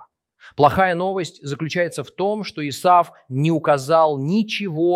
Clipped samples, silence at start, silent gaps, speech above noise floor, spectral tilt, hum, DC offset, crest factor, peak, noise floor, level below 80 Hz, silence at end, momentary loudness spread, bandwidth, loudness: under 0.1%; 0 s; none; 30 dB; -6 dB/octave; none; under 0.1%; 18 dB; -2 dBFS; -49 dBFS; -54 dBFS; 0 s; 11 LU; 15.5 kHz; -20 LUFS